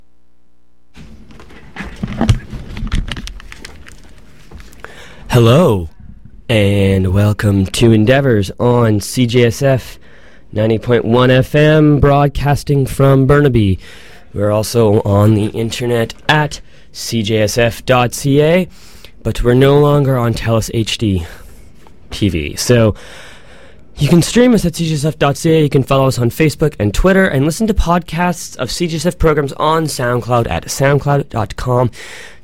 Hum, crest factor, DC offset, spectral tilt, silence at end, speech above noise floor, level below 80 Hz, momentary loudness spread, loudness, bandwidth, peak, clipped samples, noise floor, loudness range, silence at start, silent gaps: none; 14 dB; 2%; -6 dB/octave; 0.15 s; 46 dB; -28 dBFS; 15 LU; -13 LUFS; 16.5 kHz; 0 dBFS; under 0.1%; -58 dBFS; 6 LU; 0.95 s; none